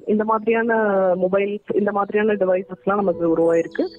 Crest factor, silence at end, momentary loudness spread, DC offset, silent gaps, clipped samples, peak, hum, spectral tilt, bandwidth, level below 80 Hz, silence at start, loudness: 12 dB; 0 s; 4 LU; under 0.1%; none; under 0.1%; -8 dBFS; none; -8 dB/octave; 8.8 kHz; -60 dBFS; 0.05 s; -20 LUFS